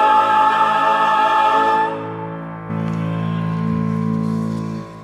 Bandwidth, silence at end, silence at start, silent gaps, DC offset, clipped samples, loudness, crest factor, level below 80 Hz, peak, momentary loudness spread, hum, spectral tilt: 11 kHz; 0 s; 0 s; none; under 0.1%; under 0.1%; -17 LUFS; 14 dB; -52 dBFS; -4 dBFS; 13 LU; none; -6.5 dB/octave